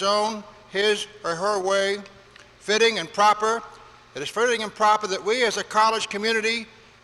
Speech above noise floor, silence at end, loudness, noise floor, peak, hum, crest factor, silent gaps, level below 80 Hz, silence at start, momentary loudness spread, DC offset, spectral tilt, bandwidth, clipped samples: 27 dB; 0.4 s; -22 LUFS; -49 dBFS; -8 dBFS; none; 16 dB; none; -64 dBFS; 0 s; 11 LU; under 0.1%; -2 dB/octave; 12.5 kHz; under 0.1%